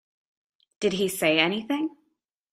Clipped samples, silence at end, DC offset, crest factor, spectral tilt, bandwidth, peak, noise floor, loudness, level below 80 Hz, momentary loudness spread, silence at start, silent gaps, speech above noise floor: under 0.1%; 0.65 s; under 0.1%; 22 dB; -4 dB/octave; 15.5 kHz; -6 dBFS; -75 dBFS; -25 LUFS; -66 dBFS; 8 LU; 0.8 s; none; 50 dB